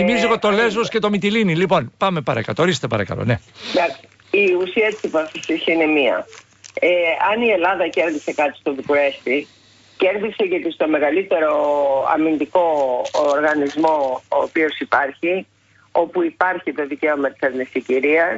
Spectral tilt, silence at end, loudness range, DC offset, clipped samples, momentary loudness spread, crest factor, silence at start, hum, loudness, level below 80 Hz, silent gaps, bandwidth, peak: -5.5 dB/octave; 0 s; 2 LU; under 0.1%; under 0.1%; 6 LU; 14 dB; 0 s; none; -19 LUFS; -56 dBFS; none; 8 kHz; -4 dBFS